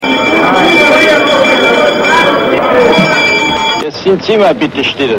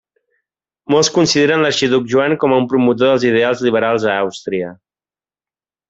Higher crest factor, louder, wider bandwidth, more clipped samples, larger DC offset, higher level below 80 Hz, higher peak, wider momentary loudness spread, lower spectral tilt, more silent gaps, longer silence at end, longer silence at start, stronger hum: second, 8 dB vs 14 dB; first, -8 LUFS vs -14 LUFS; first, 16.5 kHz vs 8 kHz; first, 0.3% vs under 0.1%; first, 0.2% vs under 0.1%; first, -42 dBFS vs -56 dBFS; about the same, 0 dBFS vs -2 dBFS; about the same, 7 LU vs 8 LU; about the same, -4 dB/octave vs -4.5 dB/octave; neither; second, 0 s vs 1.15 s; second, 0 s vs 0.9 s; neither